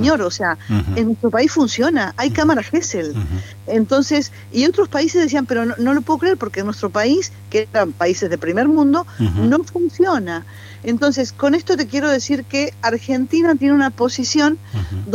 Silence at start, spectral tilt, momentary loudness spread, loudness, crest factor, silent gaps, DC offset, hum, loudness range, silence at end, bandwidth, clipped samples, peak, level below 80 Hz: 0 s; -5 dB/octave; 7 LU; -17 LUFS; 14 dB; none; under 0.1%; none; 1 LU; 0 s; 15 kHz; under 0.1%; -2 dBFS; -42 dBFS